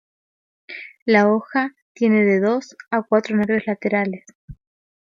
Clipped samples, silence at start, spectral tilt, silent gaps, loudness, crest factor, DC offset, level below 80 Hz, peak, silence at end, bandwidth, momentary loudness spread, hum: under 0.1%; 0.7 s; -7 dB/octave; 1.02-1.06 s, 1.82-1.95 s, 4.35-4.48 s; -20 LUFS; 18 dB; under 0.1%; -56 dBFS; -2 dBFS; 0.6 s; 7.4 kHz; 15 LU; none